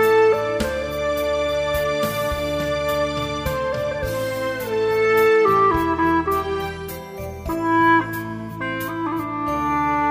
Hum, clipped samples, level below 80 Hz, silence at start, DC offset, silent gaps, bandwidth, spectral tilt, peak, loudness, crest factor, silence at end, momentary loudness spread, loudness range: none; under 0.1%; -40 dBFS; 0 s; under 0.1%; none; 16 kHz; -5.5 dB/octave; -6 dBFS; -21 LUFS; 14 dB; 0 s; 12 LU; 4 LU